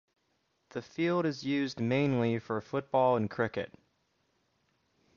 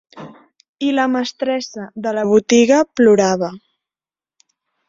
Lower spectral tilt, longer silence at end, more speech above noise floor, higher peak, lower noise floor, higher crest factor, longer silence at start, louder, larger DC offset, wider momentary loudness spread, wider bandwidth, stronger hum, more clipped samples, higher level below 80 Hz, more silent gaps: first, -7 dB/octave vs -4.5 dB/octave; first, 1.5 s vs 1.3 s; second, 46 dB vs over 75 dB; second, -16 dBFS vs -2 dBFS; second, -76 dBFS vs under -90 dBFS; about the same, 18 dB vs 16 dB; first, 0.75 s vs 0.15 s; second, -31 LUFS vs -16 LUFS; neither; about the same, 13 LU vs 11 LU; about the same, 7.2 kHz vs 7.8 kHz; neither; neither; second, -68 dBFS vs -60 dBFS; second, none vs 0.69-0.75 s